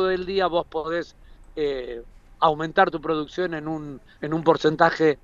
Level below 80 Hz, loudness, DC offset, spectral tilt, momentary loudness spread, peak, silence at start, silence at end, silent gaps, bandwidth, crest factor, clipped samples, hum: -50 dBFS; -23 LUFS; under 0.1%; -6.5 dB/octave; 16 LU; -2 dBFS; 0 s; 0.1 s; none; 7.4 kHz; 22 dB; under 0.1%; none